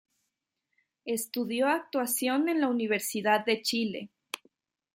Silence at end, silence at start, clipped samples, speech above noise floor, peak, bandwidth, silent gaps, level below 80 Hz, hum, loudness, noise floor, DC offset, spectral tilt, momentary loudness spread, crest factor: 0.6 s; 1.05 s; under 0.1%; 55 dB; -12 dBFS; 16.5 kHz; none; -80 dBFS; none; -29 LUFS; -84 dBFS; under 0.1%; -3 dB/octave; 15 LU; 20 dB